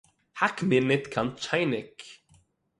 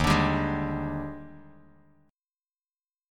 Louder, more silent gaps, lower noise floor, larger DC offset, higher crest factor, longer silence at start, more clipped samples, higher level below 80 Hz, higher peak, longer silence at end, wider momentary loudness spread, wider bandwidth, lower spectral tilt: about the same, -27 LUFS vs -28 LUFS; neither; second, -63 dBFS vs under -90 dBFS; neither; about the same, 22 dB vs 20 dB; first, 0.35 s vs 0 s; neither; second, -64 dBFS vs -42 dBFS; about the same, -8 dBFS vs -10 dBFS; second, 0.65 s vs 1.7 s; about the same, 22 LU vs 20 LU; second, 11.5 kHz vs 17 kHz; about the same, -5.5 dB/octave vs -6 dB/octave